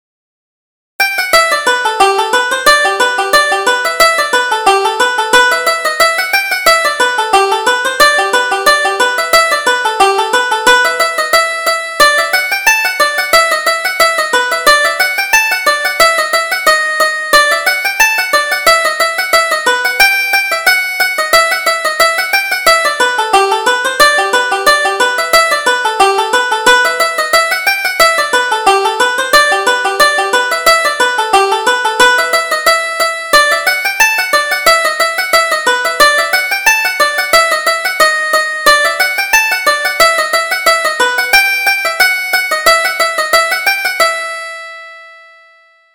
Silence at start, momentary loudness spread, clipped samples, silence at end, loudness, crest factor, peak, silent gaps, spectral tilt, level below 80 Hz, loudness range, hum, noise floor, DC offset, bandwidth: 1 s; 4 LU; 0.2%; 0.8 s; -10 LUFS; 12 dB; 0 dBFS; none; 0.5 dB/octave; -44 dBFS; 1 LU; none; -46 dBFS; under 0.1%; over 20 kHz